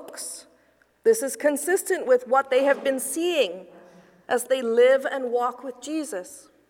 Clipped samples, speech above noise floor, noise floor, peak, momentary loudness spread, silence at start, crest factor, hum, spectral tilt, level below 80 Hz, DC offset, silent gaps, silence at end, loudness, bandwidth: under 0.1%; 39 dB; -62 dBFS; -8 dBFS; 16 LU; 0 s; 16 dB; none; -2 dB/octave; -76 dBFS; under 0.1%; none; 0.3 s; -23 LUFS; 18 kHz